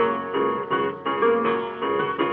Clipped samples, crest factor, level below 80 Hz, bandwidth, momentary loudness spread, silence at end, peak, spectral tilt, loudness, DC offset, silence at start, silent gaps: under 0.1%; 14 dB; -70 dBFS; 4.3 kHz; 5 LU; 0 s; -10 dBFS; -8.5 dB/octave; -23 LUFS; under 0.1%; 0 s; none